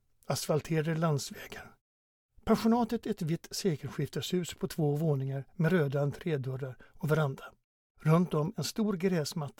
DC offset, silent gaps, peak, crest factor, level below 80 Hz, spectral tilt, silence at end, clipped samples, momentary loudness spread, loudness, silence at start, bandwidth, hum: under 0.1%; 1.81-2.29 s, 7.64-7.95 s; -12 dBFS; 20 dB; -60 dBFS; -6 dB/octave; 0.1 s; under 0.1%; 12 LU; -32 LUFS; 0.3 s; 17.5 kHz; none